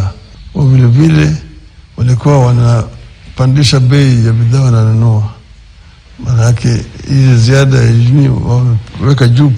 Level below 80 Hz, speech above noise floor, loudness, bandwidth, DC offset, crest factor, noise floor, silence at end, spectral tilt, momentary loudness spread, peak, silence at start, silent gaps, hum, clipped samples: -30 dBFS; 29 dB; -9 LUFS; 10 kHz; under 0.1%; 8 dB; -36 dBFS; 0 s; -7 dB/octave; 9 LU; 0 dBFS; 0 s; none; none; 1%